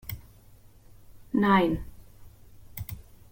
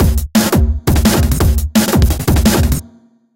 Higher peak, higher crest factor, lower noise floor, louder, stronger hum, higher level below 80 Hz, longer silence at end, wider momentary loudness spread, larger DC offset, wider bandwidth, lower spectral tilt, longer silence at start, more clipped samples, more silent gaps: second, -10 dBFS vs -2 dBFS; first, 20 dB vs 10 dB; first, -53 dBFS vs -45 dBFS; second, -26 LUFS vs -13 LUFS; neither; second, -48 dBFS vs -16 dBFS; second, 0.3 s vs 0.55 s; first, 23 LU vs 3 LU; neither; about the same, 17 kHz vs 17.5 kHz; first, -7 dB/octave vs -5.5 dB/octave; about the same, 0.05 s vs 0 s; neither; neither